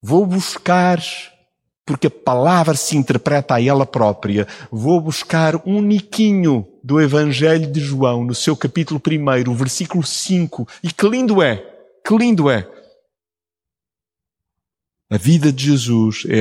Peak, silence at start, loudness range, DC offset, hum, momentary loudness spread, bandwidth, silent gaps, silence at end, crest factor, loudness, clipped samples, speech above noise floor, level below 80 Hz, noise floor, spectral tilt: -2 dBFS; 0.05 s; 5 LU; under 0.1%; none; 7 LU; 16 kHz; none; 0 s; 16 dB; -16 LUFS; under 0.1%; over 74 dB; -58 dBFS; under -90 dBFS; -5.5 dB/octave